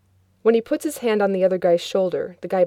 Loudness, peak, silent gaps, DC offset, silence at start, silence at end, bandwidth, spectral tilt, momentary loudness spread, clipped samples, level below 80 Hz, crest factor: -21 LUFS; -6 dBFS; none; under 0.1%; 0.45 s; 0 s; 16.5 kHz; -5.5 dB/octave; 6 LU; under 0.1%; -66 dBFS; 16 dB